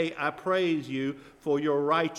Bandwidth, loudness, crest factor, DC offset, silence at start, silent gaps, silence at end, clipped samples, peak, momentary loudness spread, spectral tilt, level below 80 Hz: 12 kHz; -28 LUFS; 16 dB; under 0.1%; 0 s; none; 0 s; under 0.1%; -12 dBFS; 8 LU; -6 dB/octave; -68 dBFS